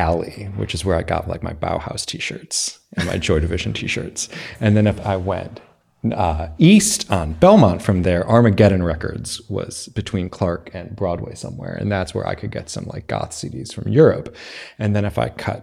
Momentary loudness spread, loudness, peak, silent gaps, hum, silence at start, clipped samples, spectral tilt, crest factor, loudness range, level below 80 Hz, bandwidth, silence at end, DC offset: 15 LU; -19 LUFS; 0 dBFS; none; none; 0 s; under 0.1%; -5.5 dB/octave; 18 dB; 10 LU; -36 dBFS; 15 kHz; 0 s; under 0.1%